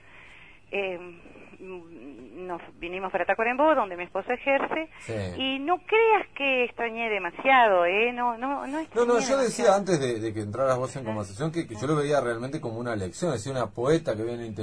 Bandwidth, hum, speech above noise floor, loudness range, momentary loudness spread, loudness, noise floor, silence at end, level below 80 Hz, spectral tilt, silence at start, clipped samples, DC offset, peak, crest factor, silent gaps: 11 kHz; none; 25 dB; 6 LU; 15 LU; -26 LUFS; -51 dBFS; 0 s; -58 dBFS; -5 dB/octave; 0.15 s; under 0.1%; 0.2%; -8 dBFS; 18 dB; none